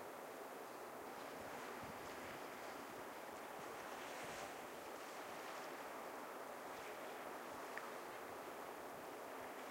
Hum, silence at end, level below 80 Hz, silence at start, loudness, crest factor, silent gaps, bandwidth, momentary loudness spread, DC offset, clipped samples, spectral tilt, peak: none; 0 s; -82 dBFS; 0 s; -51 LUFS; 20 dB; none; 16 kHz; 2 LU; under 0.1%; under 0.1%; -3 dB/octave; -32 dBFS